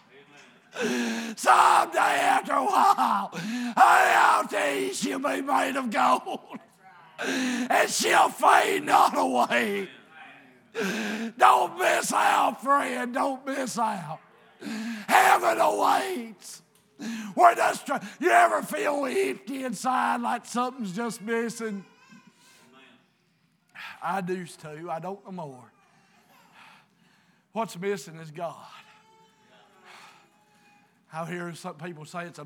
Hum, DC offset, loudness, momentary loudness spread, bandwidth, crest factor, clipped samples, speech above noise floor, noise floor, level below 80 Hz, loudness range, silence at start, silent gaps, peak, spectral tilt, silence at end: none; under 0.1%; -24 LUFS; 19 LU; over 20 kHz; 22 dB; under 0.1%; 43 dB; -68 dBFS; under -90 dBFS; 15 LU; 0.75 s; none; -4 dBFS; -3 dB/octave; 0 s